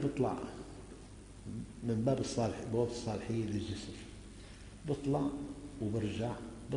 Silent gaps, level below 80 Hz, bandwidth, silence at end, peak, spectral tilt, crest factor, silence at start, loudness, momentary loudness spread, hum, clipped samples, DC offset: none; -54 dBFS; 10.5 kHz; 0 s; -20 dBFS; -6.5 dB/octave; 18 dB; 0 s; -38 LUFS; 18 LU; none; under 0.1%; under 0.1%